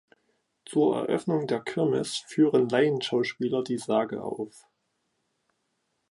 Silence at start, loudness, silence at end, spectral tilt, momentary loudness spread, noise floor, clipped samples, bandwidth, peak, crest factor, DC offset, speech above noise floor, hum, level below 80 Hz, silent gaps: 0.7 s; -27 LUFS; 1.5 s; -5.5 dB/octave; 10 LU; -77 dBFS; under 0.1%; 11.5 kHz; -10 dBFS; 18 dB; under 0.1%; 51 dB; none; -72 dBFS; none